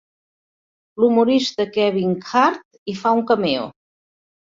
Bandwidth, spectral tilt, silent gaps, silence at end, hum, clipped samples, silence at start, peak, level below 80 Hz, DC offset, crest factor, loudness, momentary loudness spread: 7.6 kHz; -5.5 dB/octave; 2.65-2.71 s, 2.78-2.86 s; 0.8 s; none; under 0.1%; 0.95 s; -2 dBFS; -64 dBFS; under 0.1%; 18 dB; -19 LUFS; 15 LU